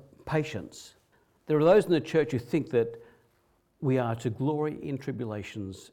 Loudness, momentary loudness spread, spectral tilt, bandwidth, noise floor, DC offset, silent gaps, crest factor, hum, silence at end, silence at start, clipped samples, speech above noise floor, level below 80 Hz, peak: -28 LUFS; 17 LU; -7 dB/octave; 15 kHz; -69 dBFS; under 0.1%; none; 18 dB; none; 0.1 s; 0.25 s; under 0.1%; 41 dB; -62 dBFS; -12 dBFS